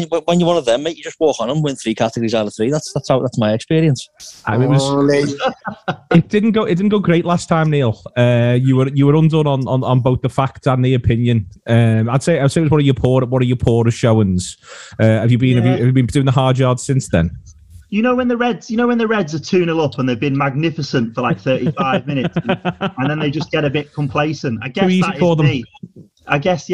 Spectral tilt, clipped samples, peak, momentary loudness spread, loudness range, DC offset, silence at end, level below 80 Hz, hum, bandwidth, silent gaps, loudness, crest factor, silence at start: -7 dB/octave; under 0.1%; 0 dBFS; 6 LU; 3 LU; 0.3%; 0 s; -42 dBFS; none; 11.5 kHz; none; -16 LUFS; 16 dB; 0 s